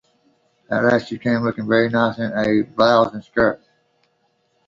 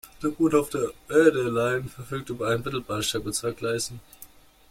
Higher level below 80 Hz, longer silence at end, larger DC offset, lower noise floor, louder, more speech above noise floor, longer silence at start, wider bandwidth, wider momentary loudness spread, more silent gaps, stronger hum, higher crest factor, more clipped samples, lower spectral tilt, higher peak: about the same, -54 dBFS vs -54 dBFS; first, 1.1 s vs 0.45 s; neither; first, -65 dBFS vs -50 dBFS; first, -19 LUFS vs -26 LUFS; first, 47 dB vs 25 dB; first, 0.7 s vs 0.05 s; second, 7.6 kHz vs 16.5 kHz; second, 6 LU vs 13 LU; neither; neither; about the same, 20 dB vs 20 dB; neither; first, -7 dB/octave vs -4.5 dB/octave; first, -2 dBFS vs -6 dBFS